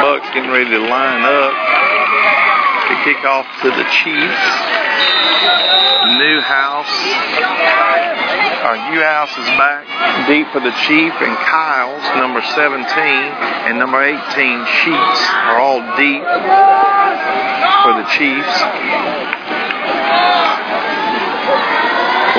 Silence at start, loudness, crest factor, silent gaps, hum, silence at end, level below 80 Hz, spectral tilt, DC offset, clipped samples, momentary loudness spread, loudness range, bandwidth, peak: 0 s; -12 LUFS; 14 dB; none; none; 0 s; -66 dBFS; -3 dB/octave; under 0.1%; under 0.1%; 6 LU; 3 LU; 5.4 kHz; 0 dBFS